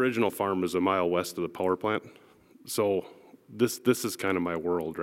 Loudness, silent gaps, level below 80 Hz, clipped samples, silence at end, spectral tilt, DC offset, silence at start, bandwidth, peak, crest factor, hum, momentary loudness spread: -29 LUFS; none; -66 dBFS; under 0.1%; 0 s; -5 dB/octave; under 0.1%; 0 s; 16.5 kHz; -10 dBFS; 20 dB; none; 7 LU